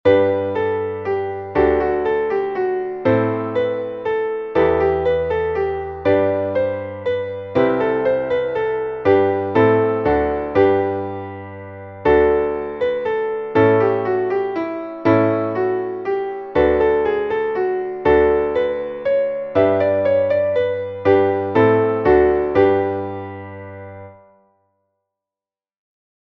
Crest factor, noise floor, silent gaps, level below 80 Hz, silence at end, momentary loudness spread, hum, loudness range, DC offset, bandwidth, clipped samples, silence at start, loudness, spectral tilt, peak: 16 dB; under -90 dBFS; none; -42 dBFS; 2.25 s; 8 LU; none; 3 LU; under 0.1%; 5.8 kHz; under 0.1%; 0.05 s; -18 LUFS; -9 dB/octave; -2 dBFS